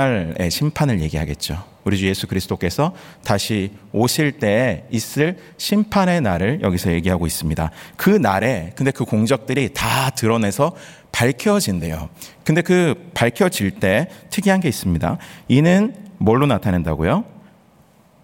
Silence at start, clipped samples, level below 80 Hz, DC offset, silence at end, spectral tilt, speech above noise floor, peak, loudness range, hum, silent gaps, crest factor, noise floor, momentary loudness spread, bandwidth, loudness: 0 s; under 0.1%; -42 dBFS; under 0.1%; 0.85 s; -5.5 dB/octave; 34 dB; -2 dBFS; 3 LU; none; none; 18 dB; -52 dBFS; 8 LU; 17 kHz; -19 LUFS